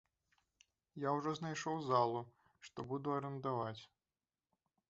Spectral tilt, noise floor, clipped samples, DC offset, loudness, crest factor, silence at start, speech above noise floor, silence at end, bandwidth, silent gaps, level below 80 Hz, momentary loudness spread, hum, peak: -5.5 dB/octave; under -90 dBFS; under 0.1%; under 0.1%; -40 LUFS; 22 dB; 0.95 s; over 50 dB; 1.05 s; 8 kHz; none; -80 dBFS; 20 LU; none; -20 dBFS